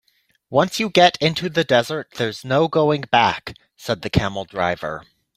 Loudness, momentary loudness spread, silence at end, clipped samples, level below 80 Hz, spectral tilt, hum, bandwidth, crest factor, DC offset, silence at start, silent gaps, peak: -19 LUFS; 13 LU; 0.35 s; under 0.1%; -46 dBFS; -5 dB/octave; none; 16 kHz; 20 dB; under 0.1%; 0.5 s; none; 0 dBFS